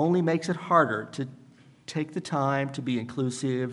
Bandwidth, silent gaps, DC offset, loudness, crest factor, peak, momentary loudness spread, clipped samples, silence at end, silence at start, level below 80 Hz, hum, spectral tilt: 11.5 kHz; none; under 0.1%; -28 LUFS; 20 dB; -6 dBFS; 13 LU; under 0.1%; 0 s; 0 s; -72 dBFS; none; -6.5 dB/octave